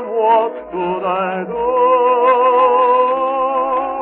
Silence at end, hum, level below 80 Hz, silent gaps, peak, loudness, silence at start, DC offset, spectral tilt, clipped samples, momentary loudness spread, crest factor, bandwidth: 0 s; none; -54 dBFS; none; -2 dBFS; -15 LUFS; 0 s; under 0.1%; -3.5 dB/octave; under 0.1%; 8 LU; 12 dB; 4 kHz